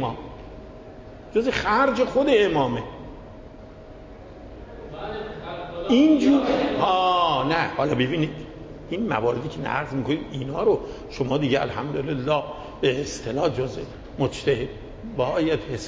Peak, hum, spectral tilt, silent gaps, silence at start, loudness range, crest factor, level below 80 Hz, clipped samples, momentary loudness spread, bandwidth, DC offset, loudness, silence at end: -8 dBFS; none; -6 dB/octave; none; 0 s; 5 LU; 16 dB; -46 dBFS; under 0.1%; 23 LU; 8 kHz; under 0.1%; -23 LUFS; 0 s